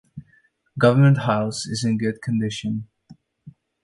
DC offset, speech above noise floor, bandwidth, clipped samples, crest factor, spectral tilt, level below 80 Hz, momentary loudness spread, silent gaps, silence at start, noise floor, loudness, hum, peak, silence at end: under 0.1%; 41 dB; 11.5 kHz; under 0.1%; 18 dB; -6.5 dB/octave; -58 dBFS; 13 LU; none; 0.15 s; -61 dBFS; -21 LUFS; none; -4 dBFS; 0.35 s